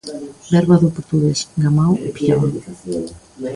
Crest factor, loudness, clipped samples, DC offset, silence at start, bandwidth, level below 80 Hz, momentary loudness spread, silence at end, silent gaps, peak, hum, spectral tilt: 16 dB; -17 LUFS; under 0.1%; under 0.1%; 0.05 s; 11.5 kHz; -46 dBFS; 16 LU; 0 s; none; -2 dBFS; none; -7 dB/octave